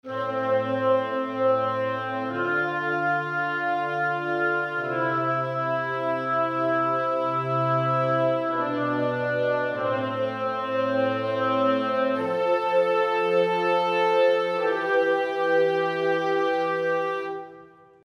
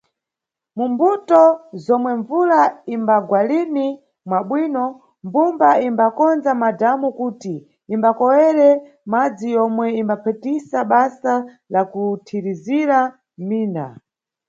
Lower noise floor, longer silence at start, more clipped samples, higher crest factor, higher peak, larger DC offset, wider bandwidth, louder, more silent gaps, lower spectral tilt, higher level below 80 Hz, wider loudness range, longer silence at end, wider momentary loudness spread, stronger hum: second, -49 dBFS vs -86 dBFS; second, 0.05 s vs 0.75 s; neither; about the same, 14 dB vs 18 dB; second, -10 dBFS vs 0 dBFS; neither; first, 9.6 kHz vs 7.6 kHz; second, -24 LUFS vs -18 LUFS; neither; about the same, -7 dB/octave vs -7.5 dB/octave; about the same, -74 dBFS vs -72 dBFS; about the same, 3 LU vs 3 LU; second, 0.4 s vs 0.6 s; second, 5 LU vs 11 LU; neither